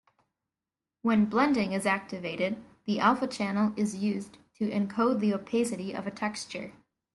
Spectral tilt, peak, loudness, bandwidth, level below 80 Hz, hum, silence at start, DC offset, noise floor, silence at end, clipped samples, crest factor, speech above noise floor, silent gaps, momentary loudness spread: -5.5 dB/octave; -10 dBFS; -29 LUFS; 12 kHz; -70 dBFS; none; 1.05 s; under 0.1%; under -90 dBFS; 0.45 s; under 0.1%; 18 dB; over 62 dB; none; 12 LU